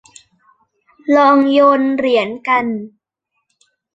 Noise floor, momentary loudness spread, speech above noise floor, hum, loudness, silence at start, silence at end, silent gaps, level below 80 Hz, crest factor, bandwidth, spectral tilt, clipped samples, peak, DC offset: -73 dBFS; 13 LU; 60 dB; none; -13 LUFS; 1.05 s; 1.05 s; none; -62 dBFS; 14 dB; 8.2 kHz; -5.5 dB/octave; under 0.1%; -2 dBFS; under 0.1%